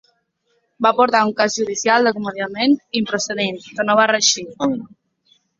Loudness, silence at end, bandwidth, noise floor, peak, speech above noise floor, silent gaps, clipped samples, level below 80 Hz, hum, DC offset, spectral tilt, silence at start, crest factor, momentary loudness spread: -18 LUFS; 0.75 s; 7.8 kHz; -67 dBFS; 0 dBFS; 49 dB; none; under 0.1%; -62 dBFS; none; under 0.1%; -2.5 dB/octave; 0.8 s; 18 dB; 9 LU